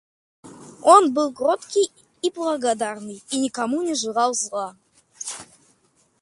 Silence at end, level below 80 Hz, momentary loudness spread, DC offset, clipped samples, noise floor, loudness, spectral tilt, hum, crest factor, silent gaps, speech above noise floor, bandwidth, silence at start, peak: 0.8 s; -72 dBFS; 18 LU; under 0.1%; under 0.1%; -63 dBFS; -21 LUFS; -2.5 dB/octave; none; 22 dB; none; 42 dB; 11.5 kHz; 0.45 s; 0 dBFS